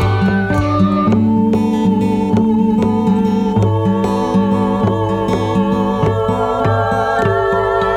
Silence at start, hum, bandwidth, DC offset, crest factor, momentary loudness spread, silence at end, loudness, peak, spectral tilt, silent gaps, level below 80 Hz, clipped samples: 0 s; none; 10 kHz; under 0.1%; 12 dB; 2 LU; 0 s; -15 LUFS; -2 dBFS; -8 dB/octave; none; -34 dBFS; under 0.1%